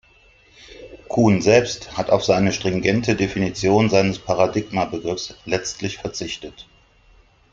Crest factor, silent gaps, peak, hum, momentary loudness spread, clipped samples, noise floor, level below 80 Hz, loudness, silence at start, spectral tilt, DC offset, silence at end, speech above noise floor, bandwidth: 20 dB; none; 0 dBFS; none; 13 LU; under 0.1%; -53 dBFS; -48 dBFS; -20 LUFS; 0.7 s; -5 dB/octave; under 0.1%; 0.9 s; 34 dB; 7.8 kHz